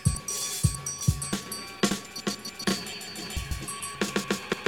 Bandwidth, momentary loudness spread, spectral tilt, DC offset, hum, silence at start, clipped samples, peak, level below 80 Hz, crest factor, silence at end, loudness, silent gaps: over 20 kHz; 7 LU; -3.5 dB/octave; under 0.1%; none; 0 s; under 0.1%; -10 dBFS; -42 dBFS; 20 dB; 0 s; -30 LUFS; none